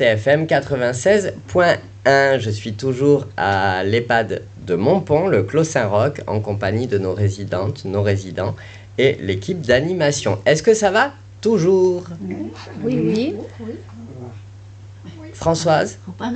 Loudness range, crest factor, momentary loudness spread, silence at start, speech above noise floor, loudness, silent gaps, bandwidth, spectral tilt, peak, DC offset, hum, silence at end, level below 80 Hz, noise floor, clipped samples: 6 LU; 16 dB; 15 LU; 0 s; 21 dB; -18 LUFS; none; 9 kHz; -5.5 dB/octave; -2 dBFS; under 0.1%; none; 0 s; -48 dBFS; -38 dBFS; under 0.1%